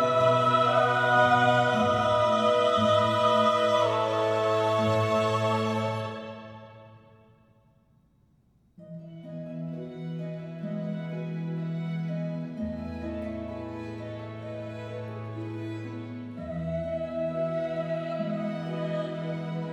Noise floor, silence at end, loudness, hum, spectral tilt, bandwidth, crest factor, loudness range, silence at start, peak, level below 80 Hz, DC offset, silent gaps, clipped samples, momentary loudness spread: -64 dBFS; 0 s; -27 LUFS; none; -6 dB/octave; 12 kHz; 18 dB; 18 LU; 0 s; -10 dBFS; -58 dBFS; under 0.1%; none; under 0.1%; 16 LU